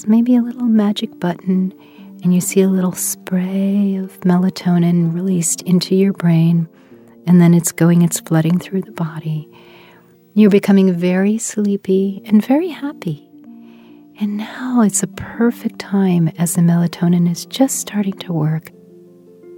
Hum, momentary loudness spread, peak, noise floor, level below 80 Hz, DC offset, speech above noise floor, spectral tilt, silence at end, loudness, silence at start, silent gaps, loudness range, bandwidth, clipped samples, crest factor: none; 11 LU; 0 dBFS; -47 dBFS; -62 dBFS; under 0.1%; 32 dB; -6 dB/octave; 0 s; -16 LUFS; 0 s; none; 5 LU; 16.5 kHz; under 0.1%; 16 dB